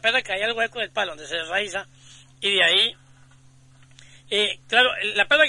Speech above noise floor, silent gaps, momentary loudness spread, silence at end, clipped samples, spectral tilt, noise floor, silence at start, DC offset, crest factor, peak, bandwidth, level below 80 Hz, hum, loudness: 30 dB; none; 10 LU; 0 s; under 0.1%; -1.5 dB/octave; -52 dBFS; 0.05 s; under 0.1%; 20 dB; -4 dBFS; 11.5 kHz; -60 dBFS; none; -21 LUFS